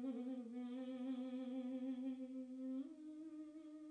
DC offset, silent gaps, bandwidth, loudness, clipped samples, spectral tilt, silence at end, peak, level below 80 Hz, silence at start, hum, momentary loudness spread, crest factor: under 0.1%; none; 9.4 kHz; -49 LUFS; under 0.1%; -6.5 dB/octave; 0 s; -36 dBFS; under -90 dBFS; 0 s; none; 8 LU; 12 dB